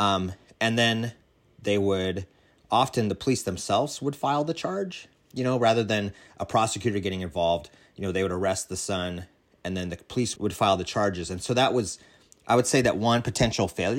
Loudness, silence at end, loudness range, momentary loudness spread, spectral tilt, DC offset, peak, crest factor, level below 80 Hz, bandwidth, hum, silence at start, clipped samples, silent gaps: -26 LUFS; 0 s; 4 LU; 12 LU; -4.5 dB/octave; under 0.1%; -8 dBFS; 18 dB; -54 dBFS; 16 kHz; none; 0 s; under 0.1%; none